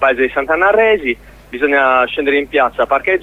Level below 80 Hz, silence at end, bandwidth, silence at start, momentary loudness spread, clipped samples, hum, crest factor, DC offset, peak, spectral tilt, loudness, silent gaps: -42 dBFS; 0 s; 7.2 kHz; 0 s; 8 LU; under 0.1%; none; 12 dB; under 0.1%; -2 dBFS; -5.5 dB/octave; -13 LUFS; none